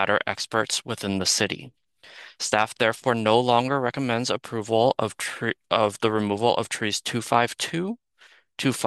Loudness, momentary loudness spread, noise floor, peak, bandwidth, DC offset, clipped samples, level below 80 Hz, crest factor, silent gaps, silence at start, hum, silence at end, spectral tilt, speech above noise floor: -24 LUFS; 8 LU; -57 dBFS; -2 dBFS; 12.5 kHz; under 0.1%; under 0.1%; -68 dBFS; 24 dB; none; 0 s; none; 0 s; -3.5 dB/octave; 32 dB